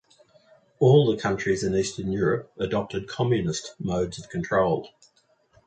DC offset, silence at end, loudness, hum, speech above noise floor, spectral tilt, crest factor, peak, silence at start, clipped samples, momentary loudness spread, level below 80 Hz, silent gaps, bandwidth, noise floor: under 0.1%; 0.8 s; -25 LUFS; none; 38 dB; -6 dB/octave; 20 dB; -6 dBFS; 0.8 s; under 0.1%; 11 LU; -52 dBFS; none; 9.4 kHz; -62 dBFS